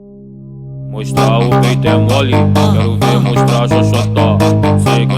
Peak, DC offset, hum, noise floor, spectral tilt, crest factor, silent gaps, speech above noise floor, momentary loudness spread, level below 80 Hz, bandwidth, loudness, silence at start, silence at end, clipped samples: 0 dBFS; under 0.1%; none; -32 dBFS; -6.5 dB/octave; 10 dB; none; 22 dB; 10 LU; -34 dBFS; 14.5 kHz; -11 LUFS; 0.05 s; 0 s; under 0.1%